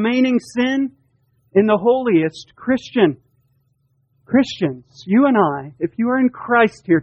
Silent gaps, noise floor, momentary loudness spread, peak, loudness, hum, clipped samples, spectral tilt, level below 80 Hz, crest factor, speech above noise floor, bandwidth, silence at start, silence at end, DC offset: none; -64 dBFS; 10 LU; -2 dBFS; -18 LUFS; none; under 0.1%; -7 dB/octave; -58 dBFS; 16 dB; 47 dB; 8.8 kHz; 0 s; 0 s; under 0.1%